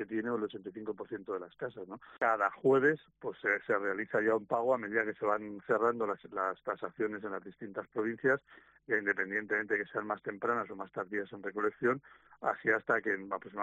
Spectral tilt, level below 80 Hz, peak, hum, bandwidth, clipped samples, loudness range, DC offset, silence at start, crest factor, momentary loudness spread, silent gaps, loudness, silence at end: -5 dB/octave; -78 dBFS; -14 dBFS; none; 8 kHz; under 0.1%; 4 LU; under 0.1%; 0 s; 20 dB; 12 LU; none; -34 LUFS; 0 s